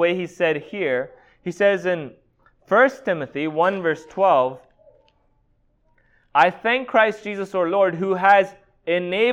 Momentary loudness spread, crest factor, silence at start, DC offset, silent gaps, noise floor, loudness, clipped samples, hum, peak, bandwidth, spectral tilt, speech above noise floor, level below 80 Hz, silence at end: 11 LU; 18 dB; 0 s; under 0.1%; none; -63 dBFS; -20 LUFS; under 0.1%; none; -2 dBFS; 10 kHz; -6 dB/octave; 43 dB; -64 dBFS; 0 s